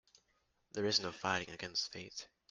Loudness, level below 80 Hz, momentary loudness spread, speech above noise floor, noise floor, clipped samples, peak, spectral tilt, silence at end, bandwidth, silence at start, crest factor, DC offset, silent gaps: -38 LUFS; -74 dBFS; 14 LU; 40 dB; -79 dBFS; under 0.1%; -18 dBFS; -2.5 dB/octave; 0.25 s; 11.5 kHz; 0.75 s; 24 dB; under 0.1%; none